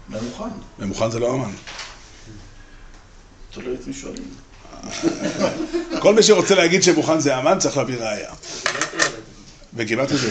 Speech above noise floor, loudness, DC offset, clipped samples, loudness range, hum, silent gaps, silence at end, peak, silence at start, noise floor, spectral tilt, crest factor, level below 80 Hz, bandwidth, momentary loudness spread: 24 dB; -19 LUFS; under 0.1%; under 0.1%; 15 LU; none; none; 0 s; -2 dBFS; 0 s; -44 dBFS; -3.5 dB/octave; 20 dB; -46 dBFS; 9.2 kHz; 20 LU